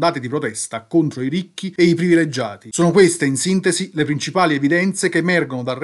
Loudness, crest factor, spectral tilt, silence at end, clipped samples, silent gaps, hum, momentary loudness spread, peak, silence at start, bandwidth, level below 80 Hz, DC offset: -18 LUFS; 16 dB; -5 dB/octave; 0 s; under 0.1%; none; none; 10 LU; 0 dBFS; 0 s; 12 kHz; -62 dBFS; under 0.1%